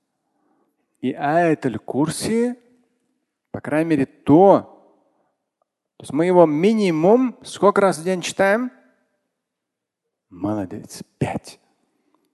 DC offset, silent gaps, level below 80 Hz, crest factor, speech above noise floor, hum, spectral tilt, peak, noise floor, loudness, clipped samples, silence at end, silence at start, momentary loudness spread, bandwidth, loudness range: under 0.1%; none; -58 dBFS; 20 dB; 64 dB; none; -6 dB/octave; 0 dBFS; -82 dBFS; -19 LUFS; under 0.1%; 0.8 s; 1.05 s; 16 LU; 12.5 kHz; 8 LU